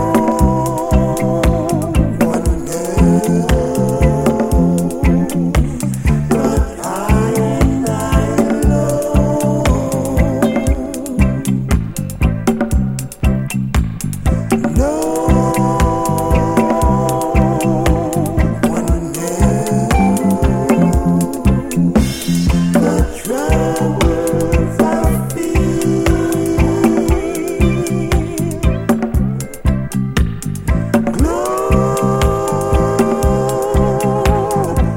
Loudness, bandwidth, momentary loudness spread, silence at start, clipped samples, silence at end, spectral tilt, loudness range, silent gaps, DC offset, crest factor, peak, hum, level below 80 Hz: -15 LUFS; 17 kHz; 5 LU; 0 s; under 0.1%; 0 s; -6.5 dB/octave; 3 LU; none; under 0.1%; 14 dB; 0 dBFS; none; -22 dBFS